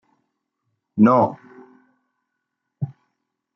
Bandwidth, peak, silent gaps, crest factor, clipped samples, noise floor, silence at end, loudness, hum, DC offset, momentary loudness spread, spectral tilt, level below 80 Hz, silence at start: 6 kHz; -4 dBFS; none; 20 dB; under 0.1%; -79 dBFS; 0.7 s; -17 LUFS; none; under 0.1%; 17 LU; -10.5 dB/octave; -70 dBFS; 0.95 s